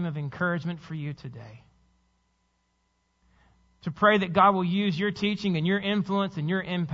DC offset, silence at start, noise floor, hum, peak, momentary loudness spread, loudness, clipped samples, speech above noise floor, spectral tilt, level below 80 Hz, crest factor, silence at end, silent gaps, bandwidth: under 0.1%; 0 s; -72 dBFS; none; -6 dBFS; 16 LU; -26 LUFS; under 0.1%; 46 dB; -7 dB/octave; -62 dBFS; 20 dB; 0 s; none; 7.4 kHz